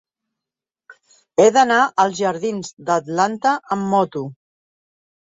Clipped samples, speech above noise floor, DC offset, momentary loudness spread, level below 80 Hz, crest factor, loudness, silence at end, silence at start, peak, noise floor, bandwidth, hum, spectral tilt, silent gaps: under 0.1%; 70 dB; under 0.1%; 11 LU; -66 dBFS; 18 dB; -18 LUFS; 0.9 s; 0.9 s; -2 dBFS; -88 dBFS; 8 kHz; none; -4.5 dB/octave; 2.73-2.77 s